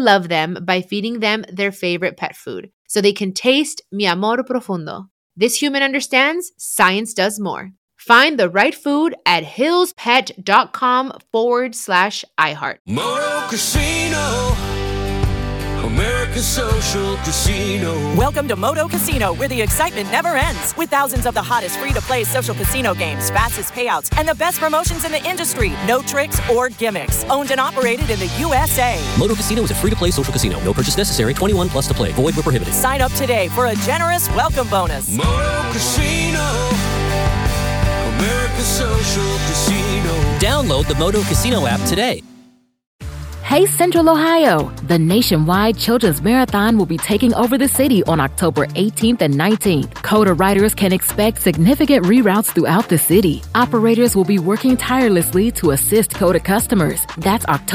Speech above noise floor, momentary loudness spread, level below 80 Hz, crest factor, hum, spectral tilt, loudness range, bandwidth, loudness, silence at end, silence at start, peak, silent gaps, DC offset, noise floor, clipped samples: 33 dB; 6 LU; -28 dBFS; 16 dB; none; -4.5 dB/octave; 4 LU; over 20 kHz; -16 LUFS; 0 s; 0 s; 0 dBFS; 2.73-2.85 s, 5.11-5.30 s, 7.77-7.88 s, 12.80-12.85 s, 42.87-42.99 s; under 0.1%; -49 dBFS; under 0.1%